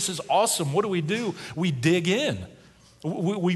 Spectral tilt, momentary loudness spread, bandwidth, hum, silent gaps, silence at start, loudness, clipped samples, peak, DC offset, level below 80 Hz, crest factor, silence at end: -4.5 dB/octave; 11 LU; 12.5 kHz; none; none; 0 s; -25 LUFS; under 0.1%; -8 dBFS; under 0.1%; -58 dBFS; 18 dB; 0 s